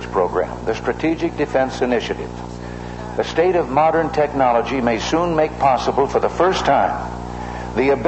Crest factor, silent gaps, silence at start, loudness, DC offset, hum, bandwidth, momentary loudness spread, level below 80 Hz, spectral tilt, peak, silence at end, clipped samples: 14 dB; none; 0 s; -19 LUFS; under 0.1%; 60 Hz at -35 dBFS; 8.4 kHz; 12 LU; -38 dBFS; -5.5 dB/octave; -4 dBFS; 0 s; under 0.1%